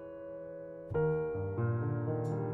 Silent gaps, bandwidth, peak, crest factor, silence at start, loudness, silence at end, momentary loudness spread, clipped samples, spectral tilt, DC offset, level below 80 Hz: none; 7.4 kHz; -20 dBFS; 14 dB; 0 s; -36 LUFS; 0 s; 12 LU; under 0.1%; -11 dB/octave; under 0.1%; -60 dBFS